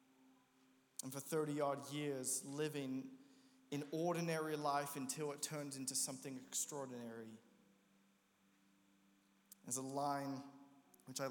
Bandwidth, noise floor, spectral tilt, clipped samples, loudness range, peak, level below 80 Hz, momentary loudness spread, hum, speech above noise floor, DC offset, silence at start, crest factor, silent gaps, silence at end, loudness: 19.5 kHz; -76 dBFS; -3.5 dB/octave; under 0.1%; 8 LU; -26 dBFS; under -90 dBFS; 13 LU; none; 32 dB; under 0.1%; 0.25 s; 20 dB; none; 0 s; -44 LUFS